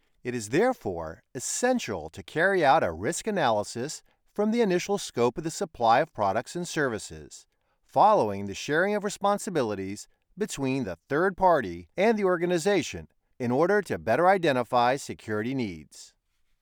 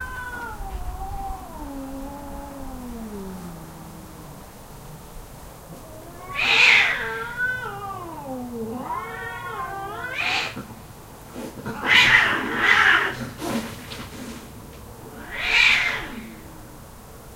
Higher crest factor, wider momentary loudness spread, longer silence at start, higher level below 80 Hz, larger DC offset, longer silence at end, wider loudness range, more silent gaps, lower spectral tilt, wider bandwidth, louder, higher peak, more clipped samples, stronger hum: second, 18 dB vs 24 dB; second, 13 LU vs 26 LU; first, 0.25 s vs 0 s; second, -60 dBFS vs -42 dBFS; neither; first, 0.55 s vs 0 s; second, 2 LU vs 18 LU; neither; first, -4.5 dB/octave vs -2.5 dB/octave; first, over 20 kHz vs 16 kHz; second, -26 LUFS vs -20 LUFS; second, -8 dBFS vs -2 dBFS; neither; neither